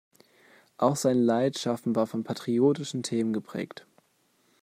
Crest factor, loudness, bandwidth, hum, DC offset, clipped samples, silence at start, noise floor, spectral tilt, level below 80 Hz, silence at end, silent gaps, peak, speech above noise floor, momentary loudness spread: 18 dB; -27 LUFS; 15 kHz; none; under 0.1%; under 0.1%; 0.8 s; -68 dBFS; -5.5 dB/octave; -74 dBFS; 0.95 s; none; -10 dBFS; 42 dB; 12 LU